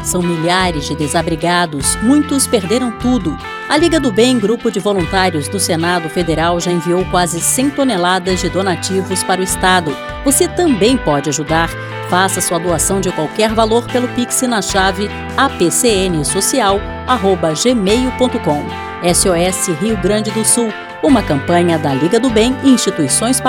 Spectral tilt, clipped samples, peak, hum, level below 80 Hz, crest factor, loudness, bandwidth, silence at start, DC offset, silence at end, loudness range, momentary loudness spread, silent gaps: -4 dB/octave; under 0.1%; 0 dBFS; none; -32 dBFS; 14 dB; -14 LUFS; 17.5 kHz; 0 s; under 0.1%; 0 s; 1 LU; 5 LU; none